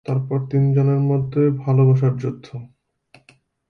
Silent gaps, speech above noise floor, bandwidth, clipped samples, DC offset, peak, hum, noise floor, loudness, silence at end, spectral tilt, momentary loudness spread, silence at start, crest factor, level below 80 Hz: none; 38 dB; 4.6 kHz; under 0.1%; under 0.1%; -6 dBFS; none; -56 dBFS; -19 LUFS; 1.05 s; -11 dB/octave; 15 LU; 0.1 s; 14 dB; -56 dBFS